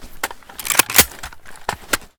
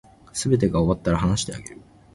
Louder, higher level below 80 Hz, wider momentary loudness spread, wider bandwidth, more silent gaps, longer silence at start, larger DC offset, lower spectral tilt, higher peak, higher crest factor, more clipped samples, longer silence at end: first, -15 LUFS vs -23 LUFS; about the same, -40 dBFS vs -38 dBFS; first, 19 LU vs 14 LU; first, over 20 kHz vs 11.5 kHz; neither; second, 0 s vs 0.35 s; neither; second, -0.5 dB/octave vs -5.5 dB/octave; first, 0 dBFS vs -6 dBFS; about the same, 22 dB vs 18 dB; neither; second, 0.1 s vs 0.4 s